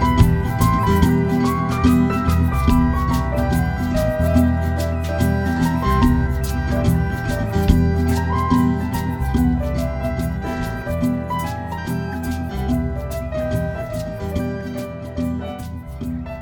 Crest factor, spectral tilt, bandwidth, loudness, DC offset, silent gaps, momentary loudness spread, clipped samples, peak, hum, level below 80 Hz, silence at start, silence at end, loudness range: 18 dB; -7.5 dB/octave; 19 kHz; -20 LUFS; under 0.1%; none; 10 LU; under 0.1%; 0 dBFS; none; -26 dBFS; 0 s; 0 s; 7 LU